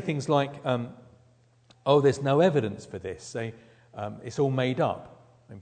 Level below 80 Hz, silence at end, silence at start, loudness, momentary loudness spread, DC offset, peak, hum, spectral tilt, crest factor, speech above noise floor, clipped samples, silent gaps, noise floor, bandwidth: -66 dBFS; 0 s; 0 s; -27 LUFS; 16 LU; under 0.1%; -6 dBFS; none; -6.5 dB/octave; 20 dB; 35 dB; under 0.1%; none; -61 dBFS; 9.4 kHz